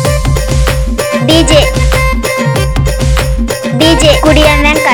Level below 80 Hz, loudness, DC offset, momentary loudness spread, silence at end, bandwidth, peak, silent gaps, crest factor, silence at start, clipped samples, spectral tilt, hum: -14 dBFS; -9 LUFS; under 0.1%; 7 LU; 0 s; 18 kHz; 0 dBFS; none; 8 dB; 0 s; 1%; -4.5 dB/octave; none